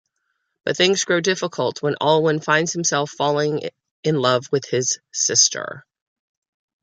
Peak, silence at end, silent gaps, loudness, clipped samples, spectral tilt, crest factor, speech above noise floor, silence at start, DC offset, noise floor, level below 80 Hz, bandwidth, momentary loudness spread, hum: -2 dBFS; 1.05 s; 3.91-4.03 s; -19 LUFS; under 0.1%; -2.5 dB/octave; 20 dB; 54 dB; 0.65 s; under 0.1%; -74 dBFS; -68 dBFS; 10.5 kHz; 11 LU; none